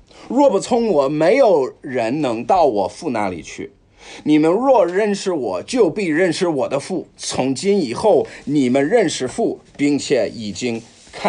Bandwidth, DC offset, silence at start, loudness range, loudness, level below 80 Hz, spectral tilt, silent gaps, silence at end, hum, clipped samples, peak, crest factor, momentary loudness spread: 10.5 kHz; under 0.1%; 0.2 s; 2 LU; -18 LUFS; -54 dBFS; -5 dB/octave; none; 0 s; none; under 0.1%; -4 dBFS; 14 dB; 10 LU